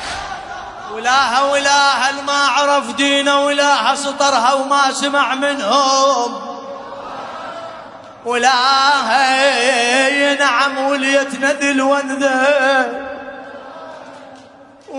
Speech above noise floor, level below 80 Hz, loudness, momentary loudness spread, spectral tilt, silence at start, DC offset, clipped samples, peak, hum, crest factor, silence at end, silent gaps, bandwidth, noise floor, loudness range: 27 dB; -56 dBFS; -14 LUFS; 17 LU; -1 dB/octave; 0 s; under 0.1%; under 0.1%; 0 dBFS; none; 16 dB; 0 s; none; 11 kHz; -42 dBFS; 4 LU